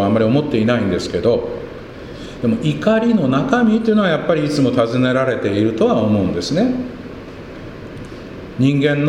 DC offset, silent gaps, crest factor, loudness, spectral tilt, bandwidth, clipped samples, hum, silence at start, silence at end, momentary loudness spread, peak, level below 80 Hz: under 0.1%; none; 16 dB; -16 LUFS; -7 dB/octave; 11 kHz; under 0.1%; none; 0 s; 0 s; 18 LU; 0 dBFS; -44 dBFS